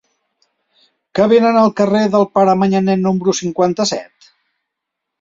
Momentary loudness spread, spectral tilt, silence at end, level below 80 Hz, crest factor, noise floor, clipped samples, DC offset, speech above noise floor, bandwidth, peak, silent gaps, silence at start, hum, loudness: 7 LU; -5.5 dB/octave; 1.15 s; -56 dBFS; 14 dB; -79 dBFS; under 0.1%; under 0.1%; 65 dB; 7.8 kHz; -2 dBFS; none; 1.15 s; none; -14 LUFS